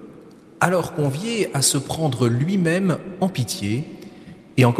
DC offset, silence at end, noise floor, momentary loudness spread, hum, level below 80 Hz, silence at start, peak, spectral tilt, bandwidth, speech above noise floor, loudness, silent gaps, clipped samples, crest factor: under 0.1%; 0 s; -45 dBFS; 9 LU; none; -56 dBFS; 0 s; 0 dBFS; -5 dB/octave; 15.5 kHz; 24 dB; -21 LUFS; none; under 0.1%; 22 dB